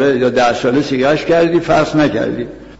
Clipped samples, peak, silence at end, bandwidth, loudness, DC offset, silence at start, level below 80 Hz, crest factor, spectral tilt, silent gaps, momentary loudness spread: under 0.1%; -2 dBFS; 0.05 s; 8 kHz; -13 LUFS; 0.6%; 0 s; -42 dBFS; 10 dB; -6 dB/octave; none; 5 LU